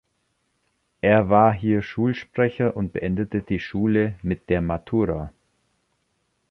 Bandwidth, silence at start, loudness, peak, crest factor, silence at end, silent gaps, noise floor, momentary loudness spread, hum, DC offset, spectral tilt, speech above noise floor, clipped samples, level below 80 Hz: 6.2 kHz; 1.05 s; -22 LUFS; -4 dBFS; 20 dB; 1.2 s; none; -71 dBFS; 9 LU; none; under 0.1%; -9.5 dB/octave; 50 dB; under 0.1%; -44 dBFS